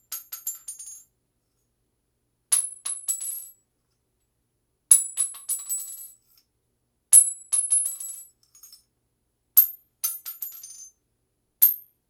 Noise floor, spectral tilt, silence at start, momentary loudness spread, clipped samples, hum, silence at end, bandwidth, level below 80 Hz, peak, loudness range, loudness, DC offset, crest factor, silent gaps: -74 dBFS; 4.5 dB/octave; 0.1 s; 21 LU; under 0.1%; 60 Hz at -80 dBFS; 0.3 s; over 20 kHz; -80 dBFS; 0 dBFS; 9 LU; -21 LUFS; under 0.1%; 28 dB; none